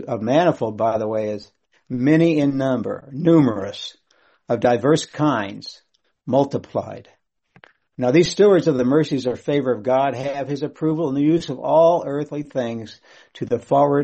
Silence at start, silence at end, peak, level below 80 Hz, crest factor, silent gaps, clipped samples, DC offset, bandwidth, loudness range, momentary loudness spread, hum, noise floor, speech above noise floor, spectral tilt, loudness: 0 s; 0 s; -2 dBFS; -58 dBFS; 18 dB; none; under 0.1%; under 0.1%; 8.4 kHz; 3 LU; 15 LU; none; -53 dBFS; 34 dB; -6.5 dB/octave; -20 LUFS